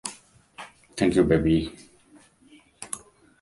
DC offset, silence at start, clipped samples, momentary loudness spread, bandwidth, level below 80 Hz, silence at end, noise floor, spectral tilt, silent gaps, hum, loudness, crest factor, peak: under 0.1%; 0.05 s; under 0.1%; 23 LU; 11.5 kHz; -44 dBFS; 0.45 s; -56 dBFS; -6 dB/octave; none; none; -24 LUFS; 22 dB; -6 dBFS